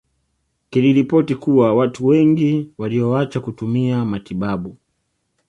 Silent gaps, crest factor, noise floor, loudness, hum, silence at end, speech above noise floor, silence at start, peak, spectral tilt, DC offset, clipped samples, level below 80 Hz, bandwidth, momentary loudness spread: none; 14 dB; -70 dBFS; -18 LUFS; none; 0.75 s; 54 dB; 0.7 s; -4 dBFS; -8.5 dB/octave; under 0.1%; under 0.1%; -54 dBFS; 9 kHz; 10 LU